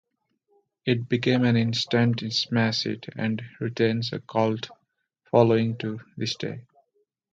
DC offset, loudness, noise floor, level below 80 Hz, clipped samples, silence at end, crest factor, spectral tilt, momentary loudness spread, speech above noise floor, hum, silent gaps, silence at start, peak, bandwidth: under 0.1%; -25 LUFS; -73 dBFS; -64 dBFS; under 0.1%; 0.7 s; 20 dB; -6 dB/octave; 12 LU; 48 dB; none; none; 0.85 s; -4 dBFS; 7.8 kHz